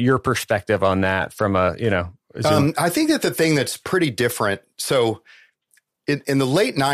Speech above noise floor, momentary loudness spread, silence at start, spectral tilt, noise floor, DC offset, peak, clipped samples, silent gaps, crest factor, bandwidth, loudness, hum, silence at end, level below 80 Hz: 44 dB; 6 LU; 0 s; -5 dB/octave; -64 dBFS; under 0.1%; -4 dBFS; under 0.1%; none; 16 dB; 15.5 kHz; -20 LUFS; none; 0 s; -52 dBFS